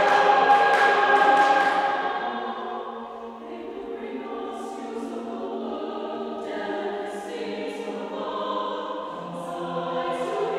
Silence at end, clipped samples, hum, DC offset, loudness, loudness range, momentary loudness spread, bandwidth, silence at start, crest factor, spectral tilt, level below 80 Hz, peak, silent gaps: 0 s; under 0.1%; none; under 0.1%; -25 LUFS; 12 LU; 16 LU; 12 kHz; 0 s; 20 dB; -4 dB/octave; -68 dBFS; -6 dBFS; none